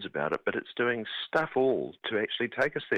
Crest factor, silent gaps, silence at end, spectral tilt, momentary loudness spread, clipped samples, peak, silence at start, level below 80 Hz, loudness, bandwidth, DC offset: 18 dB; none; 0 s; -6 dB/octave; 5 LU; under 0.1%; -12 dBFS; 0 s; -70 dBFS; -30 LUFS; 8.8 kHz; under 0.1%